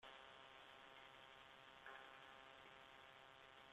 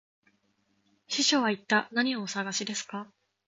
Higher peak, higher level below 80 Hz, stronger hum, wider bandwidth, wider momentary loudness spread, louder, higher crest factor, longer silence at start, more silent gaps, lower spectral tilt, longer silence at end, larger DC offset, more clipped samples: second, -42 dBFS vs -12 dBFS; second, -86 dBFS vs -80 dBFS; neither; first, 13 kHz vs 9.4 kHz; second, 4 LU vs 14 LU; second, -62 LUFS vs -28 LUFS; about the same, 20 dB vs 20 dB; second, 0 s vs 1.1 s; neither; about the same, -2.5 dB/octave vs -2 dB/octave; second, 0 s vs 0.4 s; neither; neither